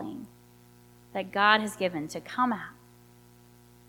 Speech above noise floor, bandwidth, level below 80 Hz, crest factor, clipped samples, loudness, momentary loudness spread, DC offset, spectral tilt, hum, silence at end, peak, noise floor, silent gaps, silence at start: 28 dB; 19 kHz; -66 dBFS; 26 dB; under 0.1%; -28 LUFS; 22 LU; under 0.1%; -4 dB/octave; 60 Hz at -55 dBFS; 1.15 s; -6 dBFS; -56 dBFS; none; 0 s